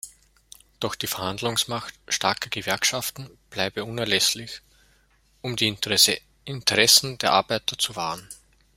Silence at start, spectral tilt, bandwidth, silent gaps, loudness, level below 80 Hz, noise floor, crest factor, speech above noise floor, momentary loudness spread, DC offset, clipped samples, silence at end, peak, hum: 0.05 s; -1.5 dB/octave; 16.5 kHz; none; -22 LUFS; -58 dBFS; -62 dBFS; 24 dB; 37 dB; 18 LU; under 0.1%; under 0.1%; 0.4 s; -2 dBFS; none